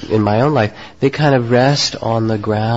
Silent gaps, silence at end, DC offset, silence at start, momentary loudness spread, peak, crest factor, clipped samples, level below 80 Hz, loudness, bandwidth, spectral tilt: none; 0 s; 0.6%; 0 s; 6 LU; -2 dBFS; 12 dB; under 0.1%; -44 dBFS; -15 LUFS; 8 kHz; -6 dB/octave